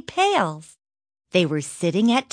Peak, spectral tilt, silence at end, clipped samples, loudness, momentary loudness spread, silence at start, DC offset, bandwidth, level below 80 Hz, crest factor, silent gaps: -4 dBFS; -5 dB/octave; 0.1 s; under 0.1%; -22 LUFS; 7 LU; 0.1 s; under 0.1%; 10.5 kHz; -66 dBFS; 18 dB; none